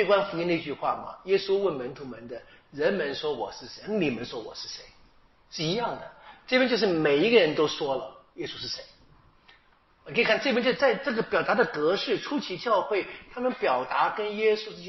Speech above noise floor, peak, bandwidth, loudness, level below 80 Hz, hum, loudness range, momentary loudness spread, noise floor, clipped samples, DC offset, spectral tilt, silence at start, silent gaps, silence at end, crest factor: 35 dB; -6 dBFS; 6 kHz; -27 LUFS; -62 dBFS; none; 6 LU; 15 LU; -61 dBFS; under 0.1%; under 0.1%; -2.5 dB/octave; 0 s; none; 0 s; 20 dB